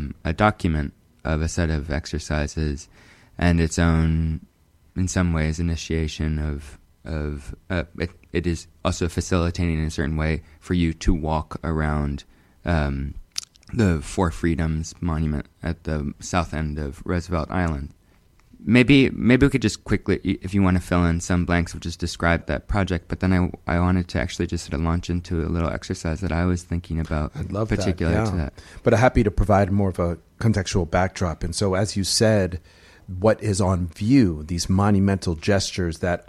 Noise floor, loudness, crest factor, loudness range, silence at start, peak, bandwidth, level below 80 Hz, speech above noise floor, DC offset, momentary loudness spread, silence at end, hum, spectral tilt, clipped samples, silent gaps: -56 dBFS; -23 LUFS; 22 dB; 6 LU; 0 s; -2 dBFS; 12.5 kHz; -34 dBFS; 34 dB; under 0.1%; 11 LU; 0.05 s; none; -6 dB/octave; under 0.1%; none